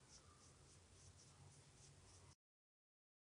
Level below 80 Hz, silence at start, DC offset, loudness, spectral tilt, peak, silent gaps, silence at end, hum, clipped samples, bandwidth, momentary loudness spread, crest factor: -80 dBFS; 0 s; under 0.1%; -66 LUFS; -3 dB/octave; -52 dBFS; none; 1 s; none; under 0.1%; 10 kHz; 2 LU; 16 dB